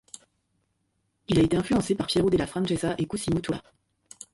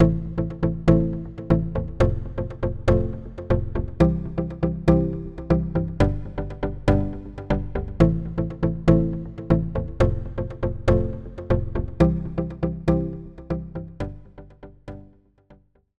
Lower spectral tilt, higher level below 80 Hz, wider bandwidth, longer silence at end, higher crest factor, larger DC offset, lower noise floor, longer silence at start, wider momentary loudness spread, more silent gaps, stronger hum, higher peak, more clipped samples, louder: second, -6 dB/octave vs -9.5 dB/octave; second, -48 dBFS vs -32 dBFS; first, 11.5 kHz vs 7.8 kHz; about the same, 0.1 s vs 0 s; about the same, 16 dB vs 20 dB; second, under 0.1% vs 0.5%; first, -75 dBFS vs -55 dBFS; first, 1.3 s vs 0 s; about the same, 14 LU vs 13 LU; neither; neither; second, -10 dBFS vs -4 dBFS; neither; about the same, -26 LUFS vs -24 LUFS